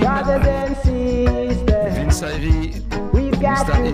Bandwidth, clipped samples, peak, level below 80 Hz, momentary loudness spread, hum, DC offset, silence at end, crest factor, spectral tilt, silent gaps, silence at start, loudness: 15 kHz; under 0.1%; -4 dBFS; -22 dBFS; 3 LU; none; under 0.1%; 0 s; 12 dB; -6.5 dB/octave; none; 0 s; -19 LUFS